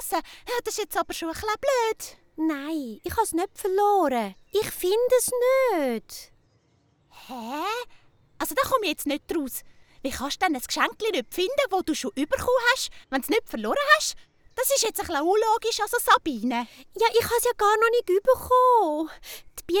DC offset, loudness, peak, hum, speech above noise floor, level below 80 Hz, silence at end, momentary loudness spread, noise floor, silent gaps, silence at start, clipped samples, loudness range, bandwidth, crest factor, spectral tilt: under 0.1%; -24 LUFS; -4 dBFS; none; 40 dB; -54 dBFS; 0 s; 13 LU; -65 dBFS; none; 0 s; under 0.1%; 7 LU; over 20 kHz; 22 dB; -2.5 dB/octave